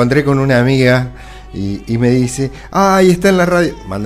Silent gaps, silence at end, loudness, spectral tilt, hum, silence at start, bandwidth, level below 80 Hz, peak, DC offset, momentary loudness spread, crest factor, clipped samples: none; 0 s; -13 LUFS; -6.5 dB/octave; none; 0 s; 15.5 kHz; -34 dBFS; 0 dBFS; under 0.1%; 12 LU; 12 dB; under 0.1%